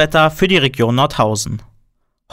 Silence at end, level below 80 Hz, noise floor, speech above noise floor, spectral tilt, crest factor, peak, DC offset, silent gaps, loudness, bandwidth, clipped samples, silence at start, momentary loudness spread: 0.7 s; -38 dBFS; -61 dBFS; 46 dB; -4.5 dB/octave; 14 dB; -2 dBFS; under 0.1%; none; -14 LUFS; 16 kHz; under 0.1%; 0 s; 10 LU